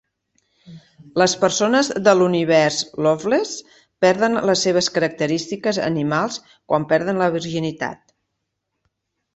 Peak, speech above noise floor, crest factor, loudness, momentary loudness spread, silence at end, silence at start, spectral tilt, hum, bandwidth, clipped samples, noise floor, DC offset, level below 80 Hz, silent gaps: -2 dBFS; 58 dB; 18 dB; -19 LUFS; 10 LU; 1.4 s; 0.7 s; -4 dB/octave; none; 8.4 kHz; under 0.1%; -77 dBFS; under 0.1%; -60 dBFS; none